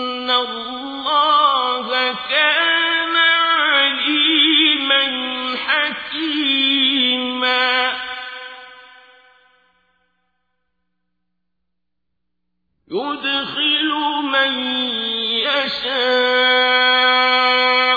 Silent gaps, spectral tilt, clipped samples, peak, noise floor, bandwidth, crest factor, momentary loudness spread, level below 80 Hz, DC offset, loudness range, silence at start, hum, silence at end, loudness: none; -3 dB/octave; under 0.1%; -4 dBFS; -79 dBFS; 5 kHz; 16 dB; 10 LU; -62 dBFS; under 0.1%; 10 LU; 0 s; none; 0 s; -15 LUFS